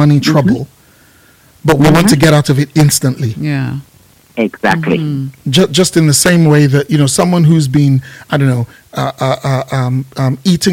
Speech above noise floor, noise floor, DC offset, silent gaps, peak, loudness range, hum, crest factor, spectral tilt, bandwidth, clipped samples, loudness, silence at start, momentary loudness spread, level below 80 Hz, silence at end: 35 dB; -45 dBFS; under 0.1%; none; 0 dBFS; 4 LU; none; 12 dB; -5.5 dB/octave; 16.5 kHz; under 0.1%; -11 LUFS; 0 s; 10 LU; -42 dBFS; 0 s